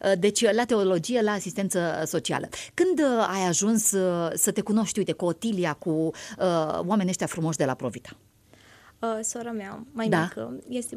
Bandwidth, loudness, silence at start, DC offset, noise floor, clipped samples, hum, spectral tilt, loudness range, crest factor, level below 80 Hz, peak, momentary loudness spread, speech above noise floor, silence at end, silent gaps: 15 kHz; -26 LUFS; 0 s; under 0.1%; -55 dBFS; under 0.1%; none; -4 dB/octave; 6 LU; 20 dB; -64 dBFS; -6 dBFS; 11 LU; 30 dB; 0 s; none